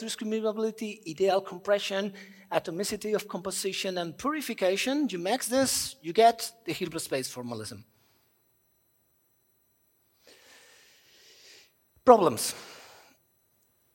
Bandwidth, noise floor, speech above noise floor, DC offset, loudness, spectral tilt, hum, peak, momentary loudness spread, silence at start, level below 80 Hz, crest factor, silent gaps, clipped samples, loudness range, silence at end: 16.5 kHz; -70 dBFS; 42 dB; under 0.1%; -28 LUFS; -3.5 dB/octave; none; -2 dBFS; 15 LU; 0 s; -68 dBFS; 28 dB; none; under 0.1%; 11 LU; 1.05 s